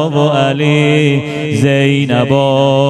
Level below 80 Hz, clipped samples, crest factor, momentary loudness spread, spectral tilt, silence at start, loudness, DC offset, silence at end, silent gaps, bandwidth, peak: -52 dBFS; under 0.1%; 10 dB; 3 LU; -6.5 dB/octave; 0 s; -12 LUFS; under 0.1%; 0 s; none; 11 kHz; 0 dBFS